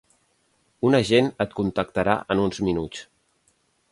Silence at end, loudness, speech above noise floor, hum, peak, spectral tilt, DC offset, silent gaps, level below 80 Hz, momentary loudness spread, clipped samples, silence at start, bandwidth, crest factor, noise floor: 0.9 s; -23 LUFS; 45 dB; none; -4 dBFS; -6 dB/octave; under 0.1%; none; -50 dBFS; 9 LU; under 0.1%; 0.8 s; 11.5 kHz; 20 dB; -67 dBFS